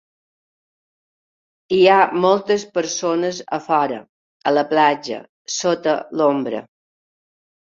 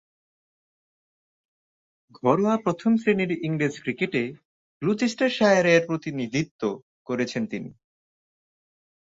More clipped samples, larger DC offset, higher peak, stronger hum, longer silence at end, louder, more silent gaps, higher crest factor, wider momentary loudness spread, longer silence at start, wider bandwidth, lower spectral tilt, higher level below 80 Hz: neither; neither; first, -2 dBFS vs -6 dBFS; neither; second, 1.1 s vs 1.35 s; first, -18 LUFS vs -24 LUFS; second, 4.09-4.40 s, 5.29-5.45 s vs 4.45-4.80 s, 6.51-6.59 s, 6.83-7.05 s; about the same, 18 dB vs 20 dB; about the same, 13 LU vs 12 LU; second, 1.7 s vs 2.25 s; about the same, 7.8 kHz vs 7.8 kHz; second, -4 dB/octave vs -6 dB/octave; about the same, -66 dBFS vs -66 dBFS